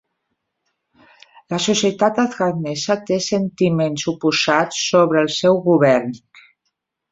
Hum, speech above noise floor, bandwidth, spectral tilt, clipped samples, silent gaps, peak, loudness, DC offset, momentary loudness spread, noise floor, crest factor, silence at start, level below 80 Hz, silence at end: none; 57 dB; 8 kHz; -4.5 dB/octave; under 0.1%; none; -2 dBFS; -18 LUFS; under 0.1%; 7 LU; -75 dBFS; 18 dB; 1.5 s; -60 dBFS; 0.95 s